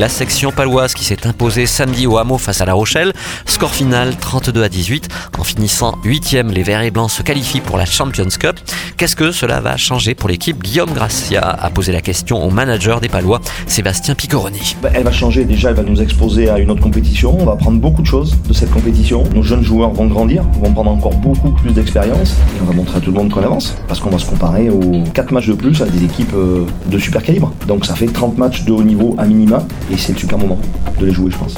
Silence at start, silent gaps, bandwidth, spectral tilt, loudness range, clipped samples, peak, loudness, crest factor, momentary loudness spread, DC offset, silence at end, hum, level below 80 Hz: 0 s; none; 19 kHz; -5 dB/octave; 2 LU; under 0.1%; 0 dBFS; -13 LUFS; 12 dB; 4 LU; under 0.1%; 0 s; none; -18 dBFS